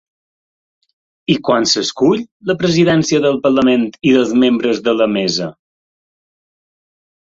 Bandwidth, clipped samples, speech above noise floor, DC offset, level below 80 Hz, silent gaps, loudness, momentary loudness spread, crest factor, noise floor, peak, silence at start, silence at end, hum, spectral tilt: 7.8 kHz; under 0.1%; over 76 dB; under 0.1%; -54 dBFS; 2.32-2.40 s; -14 LUFS; 6 LU; 14 dB; under -90 dBFS; -2 dBFS; 1.3 s; 1.8 s; none; -5 dB/octave